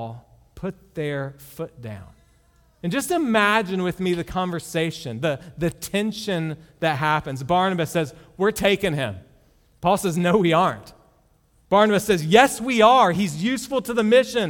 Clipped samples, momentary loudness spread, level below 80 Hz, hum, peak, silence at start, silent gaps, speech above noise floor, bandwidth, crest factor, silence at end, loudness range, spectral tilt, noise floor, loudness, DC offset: under 0.1%; 17 LU; -52 dBFS; none; 0 dBFS; 0 s; none; 38 dB; 19 kHz; 22 dB; 0 s; 7 LU; -5 dB/octave; -60 dBFS; -21 LUFS; under 0.1%